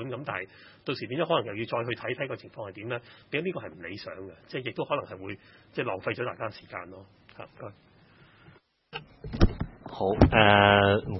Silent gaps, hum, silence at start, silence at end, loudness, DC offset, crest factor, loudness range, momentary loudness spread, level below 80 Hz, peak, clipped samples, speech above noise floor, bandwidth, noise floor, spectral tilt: none; none; 0 s; 0 s; -27 LUFS; under 0.1%; 26 dB; 12 LU; 23 LU; -40 dBFS; -2 dBFS; under 0.1%; 30 dB; 6 kHz; -58 dBFS; -7.5 dB/octave